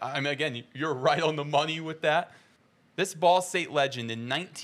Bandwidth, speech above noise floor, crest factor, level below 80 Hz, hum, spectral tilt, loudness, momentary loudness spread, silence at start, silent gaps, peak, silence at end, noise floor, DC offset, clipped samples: 15 kHz; 36 dB; 18 dB; -82 dBFS; none; -4 dB/octave; -28 LUFS; 9 LU; 0 s; none; -10 dBFS; 0 s; -64 dBFS; under 0.1%; under 0.1%